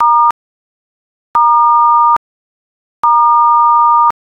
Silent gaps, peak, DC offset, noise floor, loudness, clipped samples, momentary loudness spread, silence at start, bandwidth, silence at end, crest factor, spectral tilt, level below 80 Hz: 0.31-1.34 s, 2.17-3.03 s; -2 dBFS; under 0.1%; under -90 dBFS; -9 LUFS; under 0.1%; 8 LU; 0 s; 5.2 kHz; 0.1 s; 10 dB; -3.5 dB/octave; -60 dBFS